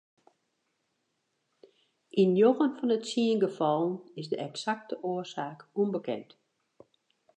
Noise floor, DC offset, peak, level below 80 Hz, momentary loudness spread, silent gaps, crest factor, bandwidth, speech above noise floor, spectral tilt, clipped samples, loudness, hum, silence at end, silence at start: -79 dBFS; under 0.1%; -12 dBFS; -86 dBFS; 14 LU; none; 20 dB; 9.4 kHz; 50 dB; -6 dB/octave; under 0.1%; -29 LUFS; none; 1.15 s; 2.15 s